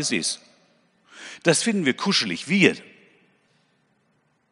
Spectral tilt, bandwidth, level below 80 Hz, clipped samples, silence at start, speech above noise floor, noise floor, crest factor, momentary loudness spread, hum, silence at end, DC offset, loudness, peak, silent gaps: -3.5 dB/octave; 11 kHz; -72 dBFS; under 0.1%; 0 s; 45 dB; -67 dBFS; 24 dB; 18 LU; none; 1.7 s; under 0.1%; -21 LUFS; 0 dBFS; none